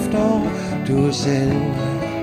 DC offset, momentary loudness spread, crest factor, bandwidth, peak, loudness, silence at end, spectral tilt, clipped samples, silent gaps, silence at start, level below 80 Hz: under 0.1%; 5 LU; 14 dB; 15 kHz; -6 dBFS; -20 LUFS; 0 s; -6.5 dB/octave; under 0.1%; none; 0 s; -40 dBFS